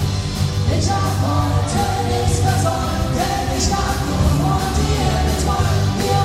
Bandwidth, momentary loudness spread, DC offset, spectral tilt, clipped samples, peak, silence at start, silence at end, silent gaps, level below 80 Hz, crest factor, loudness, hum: 16 kHz; 3 LU; under 0.1%; -5 dB/octave; under 0.1%; -4 dBFS; 0 s; 0 s; none; -26 dBFS; 12 dB; -18 LUFS; none